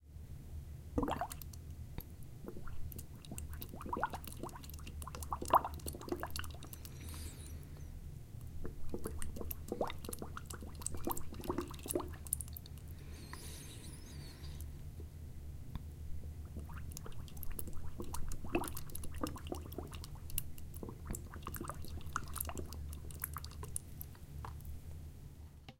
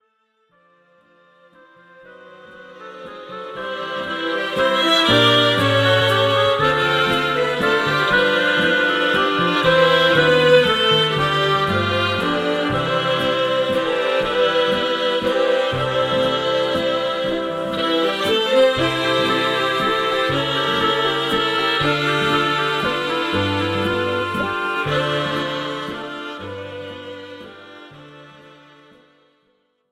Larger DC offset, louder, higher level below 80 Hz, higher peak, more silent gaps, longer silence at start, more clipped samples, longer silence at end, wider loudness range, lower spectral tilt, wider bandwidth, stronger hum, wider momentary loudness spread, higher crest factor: neither; second, -45 LUFS vs -17 LUFS; about the same, -50 dBFS vs -50 dBFS; second, -14 dBFS vs -2 dBFS; neither; second, 0 s vs 2.05 s; neither; second, 0 s vs 1.6 s; second, 8 LU vs 12 LU; about the same, -4.5 dB/octave vs -4.5 dB/octave; about the same, 17 kHz vs 15.5 kHz; neither; second, 10 LU vs 14 LU; first, 28 dB vs 18 dB